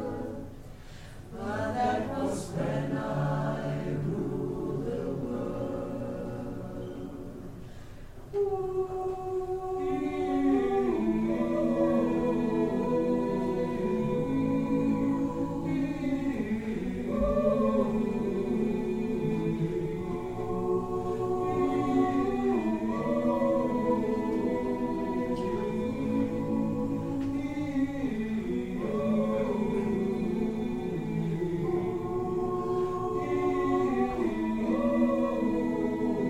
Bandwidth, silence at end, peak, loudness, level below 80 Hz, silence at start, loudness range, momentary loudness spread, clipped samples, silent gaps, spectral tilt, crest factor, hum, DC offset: 13.5 kHz; 0 s; -14 dBFS; -30 LUFS; -48 dBFS; 0 s; 6 LU; 8 LU; under 0.1%; none; -8 dB/octave; 16 dB; none; under 0.1%